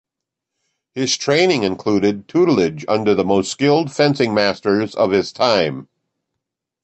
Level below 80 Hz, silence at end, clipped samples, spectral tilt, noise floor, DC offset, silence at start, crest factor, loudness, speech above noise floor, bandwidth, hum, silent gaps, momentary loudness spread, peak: -54 dBFS; 1 s; under 0.1%; -5 dB/octave; -83 dBFS; under 0.1%; 0.95 s; 16 dB; -17 LUFS; 66 dB; 8.6 kHz; none; none; 4 LU; -2 dBFS